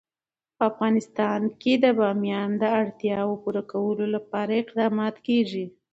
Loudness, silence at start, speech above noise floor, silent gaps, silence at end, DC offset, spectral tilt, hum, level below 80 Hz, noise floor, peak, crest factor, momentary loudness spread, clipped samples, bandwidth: -25 LUFS; 0.6 s; over 66 dB; none; 0.25 s; under 0.1%; -7 dB/octave; none; -70 dBFS; under -90 dBFS; -8 dBFS; 18 dB; 6 LU; under 0.1%; 7.8 kHz